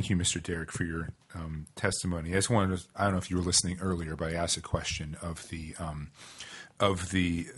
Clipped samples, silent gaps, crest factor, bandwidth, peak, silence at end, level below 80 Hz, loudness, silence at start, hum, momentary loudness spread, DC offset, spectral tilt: under 0.1%; none; 22 dB; 11.5 kHz; -10 dBFS; 0 s; -52 dBFS; -31 LUFS; 0 s; none; 15 LU; under 0.1%; -4 dB/octave